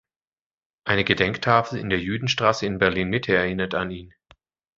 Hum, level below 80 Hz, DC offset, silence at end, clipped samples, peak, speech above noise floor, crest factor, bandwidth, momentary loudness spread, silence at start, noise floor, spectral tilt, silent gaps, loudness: none; -48 dBFS; under 0.1%; 0.7 s; under 0.1%; -2 dBFS; over 67 dB; 22 dB; 7.8 kHz; 7 LU; 0.85 s; under -90 dBFS; -5 dB/octave; none; -22 LUFS